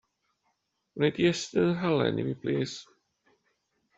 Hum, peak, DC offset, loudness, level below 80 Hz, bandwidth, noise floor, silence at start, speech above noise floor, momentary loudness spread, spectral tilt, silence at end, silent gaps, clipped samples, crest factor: none; -10 dBFS; under 0.1%; -28 LUFS; -66 dBFS; 8 kHz; -77 dBFS; 0.95 s; 49 dB; 10 LU; -6 dB/octave; 1.15 s; none; under 0.1%; 20 dB